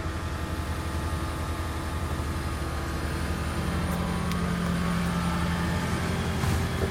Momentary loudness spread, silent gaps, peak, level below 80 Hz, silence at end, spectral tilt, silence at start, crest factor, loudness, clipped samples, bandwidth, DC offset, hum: 4 LU; none; -12 dBFS; -36 dBFS; 0 s; -5.5 dB/octave; 0 s; 16 dB; -29 LUFS; under 0.1%; 16.5 kHz; under 0.1%; none